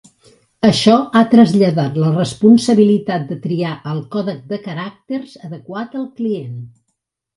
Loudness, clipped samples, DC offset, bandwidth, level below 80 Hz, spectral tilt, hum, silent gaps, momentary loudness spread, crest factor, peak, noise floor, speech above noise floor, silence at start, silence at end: -15 LUFS; under 0.1%; under 0.1%; 11.5 kHz; -56 dBFS; -6.5 dB/octave; none; none; 17 LU; 16 dB; 0 dBFS; -73 dBFS; 58 dB; 0.65 s; 0.7 s